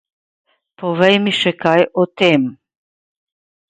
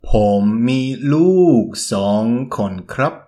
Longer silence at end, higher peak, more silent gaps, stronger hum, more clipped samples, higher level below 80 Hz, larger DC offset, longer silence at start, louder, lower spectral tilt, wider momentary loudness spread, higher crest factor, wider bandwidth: first, 1.15 s vs 0.1 s; about the same, 0 dBFS vs -2 dBFS; neither; neither; neither; second, -62 dBFS vs -30 dBFS; neither; first, 0.8 s vs 0.05 s; about the same, -15 LUFS vs -16 LUFS; about the same, -6 dB/octave vs -6.5 dB/octave; about the same, 10 LU vs 9 LU; about the same, 18 dB vs 14 dB; second, 9.4 kHz vs 13 kHz